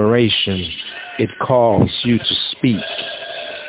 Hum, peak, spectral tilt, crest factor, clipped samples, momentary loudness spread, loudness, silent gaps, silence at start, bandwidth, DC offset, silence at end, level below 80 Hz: none; 0 dBFS; -10 dB/octave; 16 dB; under 0.1%; 12 LU; -17 LUFS; none; 0 s; 4 kHz; under 0.1%; 0 s; -42 dBFS